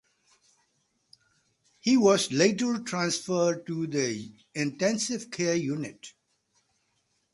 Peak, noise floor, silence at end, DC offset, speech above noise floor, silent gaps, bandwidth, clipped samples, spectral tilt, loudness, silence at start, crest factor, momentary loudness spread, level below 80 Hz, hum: -8 dBFS; -74 dBFS; 1.25 s; under 0.1%; 47 dB; none; 11.5 kHz; under 0.1%; -4 dB/octave; -27 LUFS; 1.85 s; 22 dB; 14 LU; -72 dBFS; none